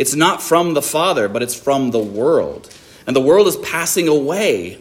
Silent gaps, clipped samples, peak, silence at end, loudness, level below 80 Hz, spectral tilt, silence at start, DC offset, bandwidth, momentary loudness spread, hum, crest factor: none; under 0.1%; 0 dBFS; 0 s; -16 LUFS; -56 dBFS; -3.5 dB/octave; 0 s; under 0.1%; 16.5 kHz; 7 LU; none; 16 dB